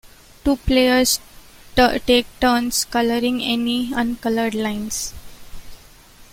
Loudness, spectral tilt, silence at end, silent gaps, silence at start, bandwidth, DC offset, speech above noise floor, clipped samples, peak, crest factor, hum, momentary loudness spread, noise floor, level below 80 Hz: -19 LUFS; -3 dB/octave; 0.1 s; none; 0.05 s; 16.5 kHz; under 0.1%; 27 dB; under 0.1%; -2 dBFS; 18 dB; none; 9 LU; -46 dBFS; -36 dBFS